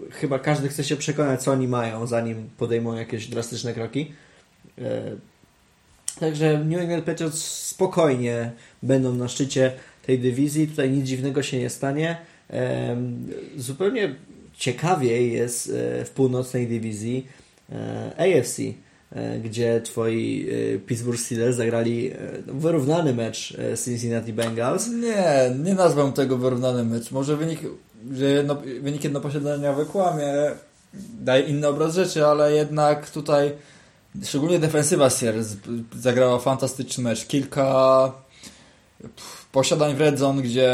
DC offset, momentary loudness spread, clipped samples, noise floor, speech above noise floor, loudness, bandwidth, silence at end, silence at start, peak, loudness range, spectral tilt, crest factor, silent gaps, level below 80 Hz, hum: under 0.1%; 13 LU; under 0.1%; -58 dBFS; 36 dB; -23 LUFS; 16.5 kHz; 0 s; 0 s; -4 dBFS; 5 LU; -5.5 dB/octave; 20 dB; none; -62 dBFS; none